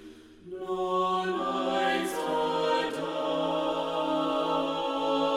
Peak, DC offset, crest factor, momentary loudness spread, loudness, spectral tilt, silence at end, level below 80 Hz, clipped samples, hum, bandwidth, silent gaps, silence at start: -14 dBFS; under 0.1%; 14 dB; 4 LU; -29 LUFS; -4.5 dB/octave; 0 s; -64 dBFS; under 0.1%; none; 16.5 kHz; none; 0 s